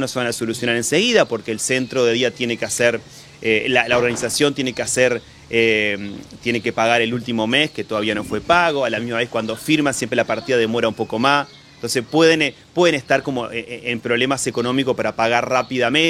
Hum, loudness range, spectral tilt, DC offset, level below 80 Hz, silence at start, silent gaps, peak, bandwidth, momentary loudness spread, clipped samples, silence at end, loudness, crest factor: none; 1 LU; -3.5 dB/octave; under 0.1%; -54 dBFS; 0 s; none; 0 dBFS; 15.5 kHz; 8 LU; under 0.1%; 0 s; -19 LUFS; 18 dB